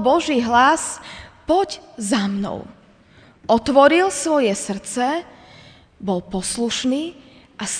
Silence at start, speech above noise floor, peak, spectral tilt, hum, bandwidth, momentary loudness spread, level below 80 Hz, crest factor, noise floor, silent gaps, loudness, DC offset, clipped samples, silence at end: 0 s; 31 dB; 0 dBFS; -3.5 dB/octave; none; 10 kHz; 17 LU; -50 dBFS; 20 dB; -50 dBFS; none; -19 LUFS; under 0.1%; under 0.1%; 0 s